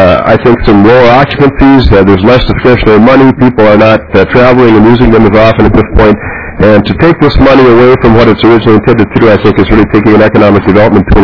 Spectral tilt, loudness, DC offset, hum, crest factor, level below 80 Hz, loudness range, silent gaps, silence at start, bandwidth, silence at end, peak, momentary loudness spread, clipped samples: -8.5 dB/octave; -4 LUFS; 3%; none; 4 dB; -18 dBFS; 1 LU; none; 0 s; 5.4 kHz; 0 s; 0 dBFS; 3 LU; 30%